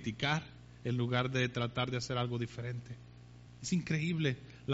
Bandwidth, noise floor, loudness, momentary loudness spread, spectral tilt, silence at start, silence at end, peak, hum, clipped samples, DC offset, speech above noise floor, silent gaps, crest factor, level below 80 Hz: 8 kHz; -54 dBFS; -36 LUFS; 18 LU; -5 dB/octave; 0 s; 0 s; -18 dBFS; 60 Hz at -50 dBFS; under 0.1%; under 0.1%; 19 dB; none; 18 dB; -62 dBFS